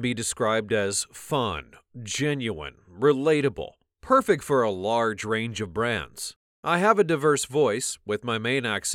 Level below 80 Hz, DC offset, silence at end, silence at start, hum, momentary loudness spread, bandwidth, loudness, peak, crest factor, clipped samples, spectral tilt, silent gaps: -56 dBFS; under 0.1%; 0 s; 0 s; none; 14 LU; 16.5 kHz; -25 LUFS; -4 dBFS; 20 dB; under 0.1%; -4 dB/octave; 6.36-6.63 s